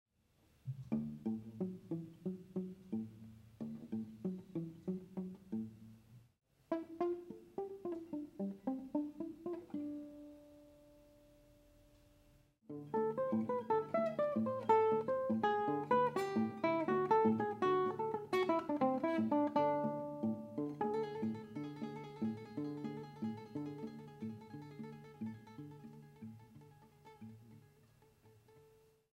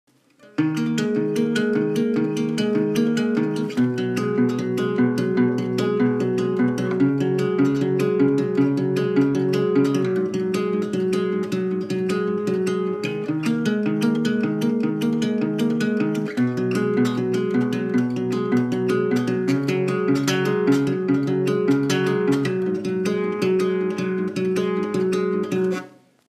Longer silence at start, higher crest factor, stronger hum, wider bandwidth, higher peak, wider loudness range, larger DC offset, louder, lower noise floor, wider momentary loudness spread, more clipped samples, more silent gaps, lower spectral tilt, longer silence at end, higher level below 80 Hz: about the same, 0.65 s vs 0.6 s; first, 20 dB vs 14 dB; neither; about the same, 14 kHz vs 14.5 kHz; second, -20 dBFS vs -6 dBFS; first, 17 LU vs 2 LU; neither; second, -39 LUFS vs -22 LUFS; first, -74 dBFS vs -52 dBFS; first, 18 LU vs 4 LU; neither; neither; about the same, -8 dB/octave vs -7 dB/octave; first, 0.55 s vs 0.4 s; second, -76 dBFS vs -66 dBFS